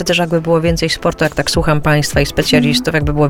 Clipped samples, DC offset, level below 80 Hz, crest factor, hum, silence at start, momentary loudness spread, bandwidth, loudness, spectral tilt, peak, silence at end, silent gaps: under 0.1%; under 0.1%; -28 dBFS; 14 dB; none; 0 s; 4 LU; 17 kHz; -14 LUFS; -5 dB/octave; 0 dBFS; 0 s; none